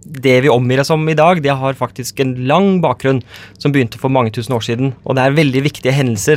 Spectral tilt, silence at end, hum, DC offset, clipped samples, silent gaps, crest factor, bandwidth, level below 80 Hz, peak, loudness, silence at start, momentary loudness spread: -6 dB/octave; 0 s; none; under 0.1%; under 0.1%; none; 14 dB; 16 kHz; -50 dBFS; 0 dBFS; -14 LUFS; 0.05 s; 7 LU